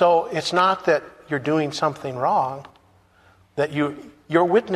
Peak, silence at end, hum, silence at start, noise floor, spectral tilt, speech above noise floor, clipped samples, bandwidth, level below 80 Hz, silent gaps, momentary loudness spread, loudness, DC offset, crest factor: -4 dBFS; 0 s; none; 0 s; -56 dBFS; -5.5 dB/octave; 35 dB; under 0.1%; 13 kHz; -62 dBFS; none; 10 LU; -22 LUFS; under 0.1%; 18 dB